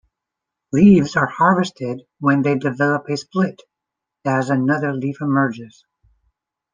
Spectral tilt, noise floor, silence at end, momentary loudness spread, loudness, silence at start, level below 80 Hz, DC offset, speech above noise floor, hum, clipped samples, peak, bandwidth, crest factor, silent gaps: -7 dB/octave; -83 dBFS; 1.05 s; 11 LU; -18 LUFS; 0.75 s; -54 dBFS; under 0.1%; 66 dB; none; under 0.1%; -2 dBFS; 9 kHz; 18 dB; none